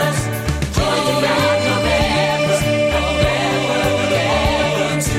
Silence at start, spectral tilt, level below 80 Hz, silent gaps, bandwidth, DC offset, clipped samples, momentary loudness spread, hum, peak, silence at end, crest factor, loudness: 0 s; -4.5 dB/octave; -30 dBFS; none; 16.5 kHz; under 0.1%; under 0.1%; 3 LU; none; -2 dBFS; 0 s; 14 dB; -16 LUFS